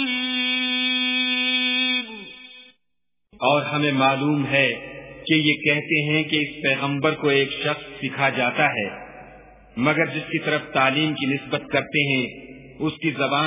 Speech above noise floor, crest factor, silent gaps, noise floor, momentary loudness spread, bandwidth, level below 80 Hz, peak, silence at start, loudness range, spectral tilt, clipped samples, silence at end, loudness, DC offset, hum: 61 dB; 20 dB; none; -83 dBFS; 12 LU; 3.9 kHz; -60 dBFS; -4 dBFS; 0 s; 3 LU; -8.5 dB/octave; under 0.1%; 0 s; -21 LUFS; under 0.1%; none